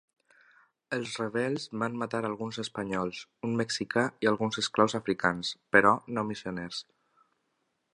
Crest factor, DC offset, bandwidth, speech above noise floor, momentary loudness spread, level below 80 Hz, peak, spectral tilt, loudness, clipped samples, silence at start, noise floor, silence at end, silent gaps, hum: 26 dB; under 0.1%; 11 kHz; 48 dB; 12 LU; -66 dBFS; -6 dBFS; -4.5 dB/octave; -30 LUFS; under 0.1%; 0.9 s; -78 dBFS; 1.1 s; none; none